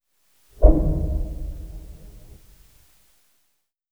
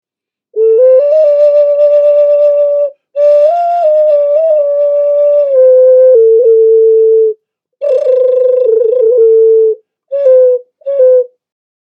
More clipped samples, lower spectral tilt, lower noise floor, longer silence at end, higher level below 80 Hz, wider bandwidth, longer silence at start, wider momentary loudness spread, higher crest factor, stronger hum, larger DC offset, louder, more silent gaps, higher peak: neither; first, -10 dB/octave vs -4 dB/octave; second, -72 dBFS vs -85 dBFS; first, 1.75 s vs 0.65 s; first, -24 dBFS vs -82 dBFS; second, 1.5 kHz vs 5.2 kHz; about the same, 0.6 s vs 0.55 s; first, 26 LU vs 8 LU; first, 24 dB vs 8 dB; neither; first, 0.1% vs under 0.1%; second, -23 LUFS vs -8 LUFS; neither; about the same, 0 dBFS vs 0 dBFS